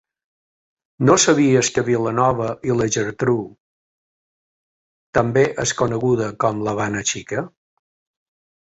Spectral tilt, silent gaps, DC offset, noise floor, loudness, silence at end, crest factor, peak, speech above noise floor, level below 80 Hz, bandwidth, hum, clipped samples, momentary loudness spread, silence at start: -4.5 dB/octave; 3.60-5.13 s; under 0.1%; under -90 dBFS; -19 LUFS; 1.25 s; 20 dB; -2 dBFS; over 72 dB; -52 dBFS; 8.4 kHz; none; under 0.1%; 9 LU; 1 s